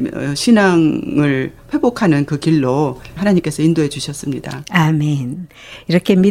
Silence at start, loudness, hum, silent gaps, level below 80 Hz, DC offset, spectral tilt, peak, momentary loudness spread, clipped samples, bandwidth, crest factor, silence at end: 0 s; -16 LUFS; none; none; -46 dBFS; under 0.1%; -6.5 dB/octave; 0 dBFS; 11 LU; under 0.1%; 15.5 kHz; 14 dB; 0 s